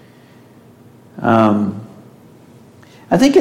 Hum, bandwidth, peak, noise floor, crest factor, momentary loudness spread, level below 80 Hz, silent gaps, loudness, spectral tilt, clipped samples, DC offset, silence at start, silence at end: 60 Hz at -45 dBFS; 16 kHz; -2 dBFS; -44 dBFS; 16 dB; 25 LU; -52 dBFS; none; -15 LUFS; -6.5 dB/octave; under 0.1%; under 0.1%; 1.15 s; 0 s